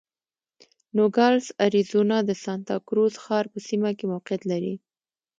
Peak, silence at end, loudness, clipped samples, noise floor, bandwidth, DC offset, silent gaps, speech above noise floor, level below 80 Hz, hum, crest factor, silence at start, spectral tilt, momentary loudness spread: -6 dBFS; 0.6 s; -24 LUFS; under 0.1%; under -90 dBFS; 7.8 kHz; under 0.1%; none; over 67 dB; -74 dBFS; none; 18 dB; 0.95 s; -6 dB/octave; 9 LU